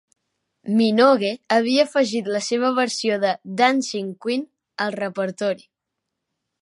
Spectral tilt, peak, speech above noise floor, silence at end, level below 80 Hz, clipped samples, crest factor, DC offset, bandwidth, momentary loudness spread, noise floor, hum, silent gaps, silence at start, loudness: -4 dB/octave; -2 dBFS; 61 dB; 1.05 s; -76 dBFS; under 0.1%; 20 dB; under 0.1%; 11.5 kHz; 11 LU; -81 dBFS; none; none; 0.65 s; -21 LUFS